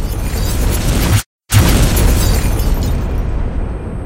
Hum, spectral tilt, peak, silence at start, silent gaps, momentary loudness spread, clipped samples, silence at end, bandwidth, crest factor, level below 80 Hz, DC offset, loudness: none; -5 dB/octave; 0 dBFS; 0 s; 1.26-1.39 s; 9 LU; under 0.1%; 0 s; 17 kHz; 14 dB; -16 dBFS; under 0.1%; -15 LUFS